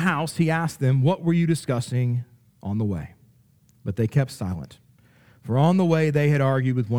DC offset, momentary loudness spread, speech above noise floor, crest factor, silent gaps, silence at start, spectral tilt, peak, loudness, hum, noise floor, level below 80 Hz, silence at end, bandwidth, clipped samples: under 0.1%; 14 LU; 37 dB; 16 dB; none; 0 s; -7.5 dB/octave; -6 dBFS; -23 LUFS; none; -58 dBFS; -56 dBFS; 0 s; 15 kHz; under 0.1%